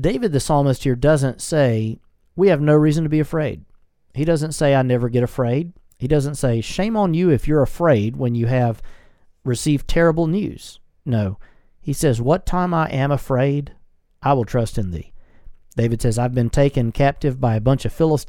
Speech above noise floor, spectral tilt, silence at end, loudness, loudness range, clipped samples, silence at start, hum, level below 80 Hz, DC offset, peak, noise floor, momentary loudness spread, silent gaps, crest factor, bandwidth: 29 dB; -7 dB/octave; 0 s; -19 LUFS; 3 LU; under 0.1%; 0 s; none; -34 dBFS; under 0.1%; -2 dBFS; -47 dBFS; 12 LU; none; 18 dB; 17.5 kHz